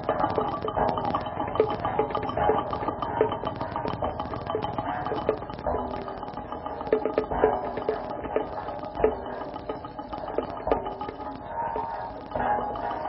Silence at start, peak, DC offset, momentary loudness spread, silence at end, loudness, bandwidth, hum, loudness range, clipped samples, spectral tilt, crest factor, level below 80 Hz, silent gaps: 0 s; -6 dBFS; under 0.1%; 10 LU; 0 s; -29 LUFS; 5.8 kHz; none; 4 LU; under 0.1%; -10.5 dB/octave; 24 dB; -46 dBFS; none